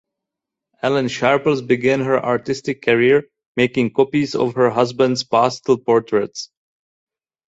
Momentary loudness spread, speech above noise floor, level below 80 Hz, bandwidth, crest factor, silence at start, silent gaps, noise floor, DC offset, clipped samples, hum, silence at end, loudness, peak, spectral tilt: 6 LU; 67 dB; -58 dBFS; 8 kHz; 18 dB; 0.85 s; 3.46-3.55 s; -84 dBFS; under 0.1%; under 0.1%; none; 1 s; -18 LUFS; 0 dBFS; -5.5 dB/octave